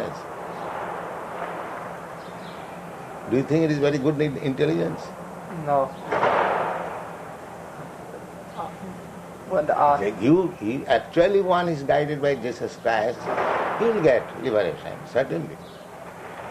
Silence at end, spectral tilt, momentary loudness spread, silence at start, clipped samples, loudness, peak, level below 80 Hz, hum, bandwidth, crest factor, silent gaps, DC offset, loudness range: 0 s; -6.5 dB/octave; 18 LU; 0 s; under 0.1%; -24 LUFS; -6 dBFS; -58 dBFS; none; 14.5 kHz; 20 dB; none; under 0.1%; 7 LU